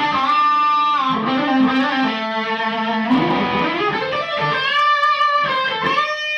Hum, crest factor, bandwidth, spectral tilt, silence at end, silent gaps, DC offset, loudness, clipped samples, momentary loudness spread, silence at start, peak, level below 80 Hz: none; 12 dB; 9 kHz; -5 dB/octave; 0 s; none; under 0.1%; -17 LUFS; under 0.1%; 5 LU; 0 s; -6 dBFS; -56 dBFS